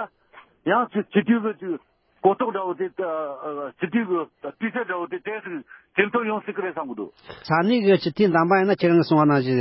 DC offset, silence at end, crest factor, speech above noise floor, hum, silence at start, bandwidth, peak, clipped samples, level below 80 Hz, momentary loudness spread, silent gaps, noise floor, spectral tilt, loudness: under 0.1%; 0 s; 18 dB; 30 dB; none; 0 s; 5.8 kHz; -4 dBFS; under 0.1%; -68 dBFS; 14 LU; none; -52 dBFS; -11 dB/octave; -23 LUFS